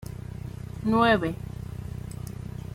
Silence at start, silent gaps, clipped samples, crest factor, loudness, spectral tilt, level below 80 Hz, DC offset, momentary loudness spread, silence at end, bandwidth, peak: 0 s; none; under 0.1%; 22 dB; -28 LUFS; -6.5 dB/octave; -44 dBFS; under 0.1%; 17 LU; 0 s; 16 kHz; -6 dBFS